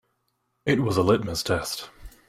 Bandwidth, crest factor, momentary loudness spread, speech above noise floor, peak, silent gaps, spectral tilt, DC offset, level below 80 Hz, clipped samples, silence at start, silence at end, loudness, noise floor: 16 kHz; 18 dB; 12 LU; 50 dB; -8 dBFS; none; -5 dB/octave; under 0.1%; -50 dBFS; under 0.1%; 0.65 s; 0.2 s; -25 LUFS; -74 dBFS